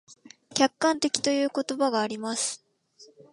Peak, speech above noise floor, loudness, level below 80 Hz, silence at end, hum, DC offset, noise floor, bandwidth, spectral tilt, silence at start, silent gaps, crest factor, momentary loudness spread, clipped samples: -2 dBFS; 31 dB; -26 LUFS; -74 dBFS; 0.3 s; none; under 0.1%; -56 dBFS; 11.5 kHz; -2 dB/octave; 0.1 s; none; 24 dB; 7 LU; under 0.1%